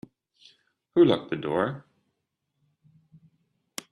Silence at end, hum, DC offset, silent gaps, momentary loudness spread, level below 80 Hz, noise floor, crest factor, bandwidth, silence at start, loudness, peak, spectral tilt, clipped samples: 2.1 s; none; under 0.1%; none; 20 LU; -68 dBFS; -80 dBFS; 22 dB; 12.5 kHz; 0.95 s; -25 LUFS; -8 dBFS; -6 dB/octave; under 0.1%